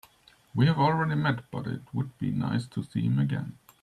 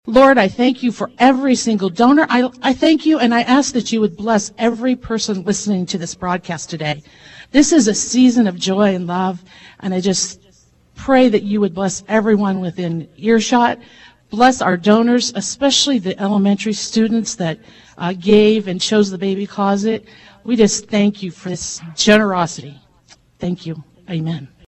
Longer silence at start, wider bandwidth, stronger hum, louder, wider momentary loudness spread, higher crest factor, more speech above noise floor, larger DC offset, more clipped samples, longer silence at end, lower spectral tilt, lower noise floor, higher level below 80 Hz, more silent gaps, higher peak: first, 0.55 s vs 0.05 s; first, 12.5 kHz vs 8.4 kHz; neither; second, -28 LUFS vs -16 LUFS; about the same, 11 LU vs 13 LU; about the same, 18 dB vs 14 dB; second, 33 dB vs 37 dB; neither; neither; about the same, 0.3 s vs 0.25 s; first, -8 dB/octave vs -4.5 dB/octave; first, -60 dBFS vs -52 dBFS; second, -62 dBFS vs -50 dBFS; neither; second, -10 dBFS vs 0 dBFS